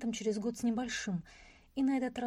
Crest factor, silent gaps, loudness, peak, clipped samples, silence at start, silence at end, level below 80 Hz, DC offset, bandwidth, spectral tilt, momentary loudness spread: 12 dB; none; -35 LUFS; -24 dBFS; under 0.1%; 0 s; 0 s; -64 dBFS; under 0.1%; 15 kHz; -5 dB/octave; 10 LU